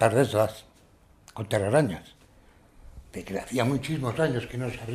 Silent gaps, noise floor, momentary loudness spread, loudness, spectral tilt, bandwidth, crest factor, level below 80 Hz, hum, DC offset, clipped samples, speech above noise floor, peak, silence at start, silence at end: none; -58 dBFS; 18 LU; -27 LUFS; -6 dB/octave; 15.5 kHz; 22 dB; -54 dBFS; none; under 0.1%; under 0.1%; 31 dB; -6 dBFS; 0 s; 0 s